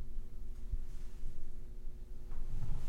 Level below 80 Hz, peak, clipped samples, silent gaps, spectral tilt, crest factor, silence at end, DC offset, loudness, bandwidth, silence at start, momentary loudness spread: -40 dBFS; -22 dBFS; under 0.1%; none; -7 dB/octave; 12 dB; 0 s; under 0.1%; -50 LUFS; 1.5 kHz; 0 s; 7 LU